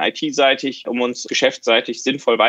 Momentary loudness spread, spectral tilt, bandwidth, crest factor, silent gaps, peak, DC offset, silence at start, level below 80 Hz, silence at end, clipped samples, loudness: 6 LU; -2.5 dB/octave; 8.6 kHz; 18 dB; none; 0 dBFS; under 0.1%; 0 s; -72 dBFS; 0 s; under 0.1%; -18 LUFS